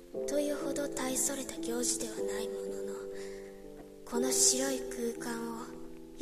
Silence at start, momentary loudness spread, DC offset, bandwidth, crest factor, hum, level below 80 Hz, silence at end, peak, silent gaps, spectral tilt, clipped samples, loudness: 0 s; 21 LU; under 0.1%; 14 kHz; 22 dB; none; -58 dBFS; 0 s; -12 dBFS; none; -2 dB/octave; under 0.1%; -33 LUFS